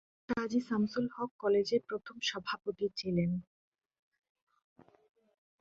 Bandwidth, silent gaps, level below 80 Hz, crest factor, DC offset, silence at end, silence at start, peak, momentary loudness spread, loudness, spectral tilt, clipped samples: 7.6 kHz; 1.31-1.39 s; -68 dBFS; 16 dB; under 0.1%; 2.2 s; 0.3 s; -20 dBFS; 7 LU; -35 LUFS; -6 dB/octave; under 0.1%